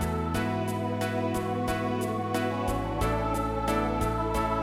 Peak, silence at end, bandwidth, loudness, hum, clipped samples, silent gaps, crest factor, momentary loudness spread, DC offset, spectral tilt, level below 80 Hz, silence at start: -14 dBFS; 0 s; 16.5 kHz; -29 LUFS; none; under 0.1%; none; 14 dB; 2 LU; under 0.1%; -6 dB/octave; -38 dBFS; 0 s